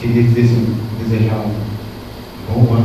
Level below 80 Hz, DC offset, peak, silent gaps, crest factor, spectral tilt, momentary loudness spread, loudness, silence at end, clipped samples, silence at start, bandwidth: -36 dBFS; under 0.1%; 0 dBFS; none; 14 dB; -8.5 dB/octave; 18 LU; -16 LUFS; 0 s; under 0.1%; 0 s; 14 kHz